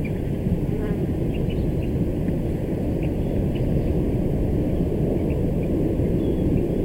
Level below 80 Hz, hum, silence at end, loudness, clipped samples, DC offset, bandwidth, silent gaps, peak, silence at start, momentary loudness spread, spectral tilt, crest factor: -30 dBFS; none; 0 s; -24 LUFS; under 0.1%; under 0.1%; 16 kHz; none; -8 dBFS; 0 s; 3 LU; -9.5 dB/octave; 14 dB